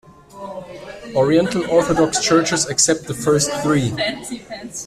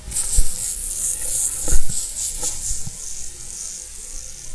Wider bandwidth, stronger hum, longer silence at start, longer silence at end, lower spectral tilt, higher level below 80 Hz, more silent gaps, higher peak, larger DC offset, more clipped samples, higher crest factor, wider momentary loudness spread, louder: first, 14.5 kHz vs 11 kHz; neither; first, 0.35 s vs 0 s; about the same, 0 s vs 0 s; first, -4 dB/octave vs -1.5 dB/octave; second, -48 dBFS vs -26 dBFS; neither; about the same, 0 dBFS vs 0 dBFS; neither; neither; about the same, 18 dB vs 18 dB; first, 18 LU vs 12 LU; first, -17 LUFS vs -23 LUFS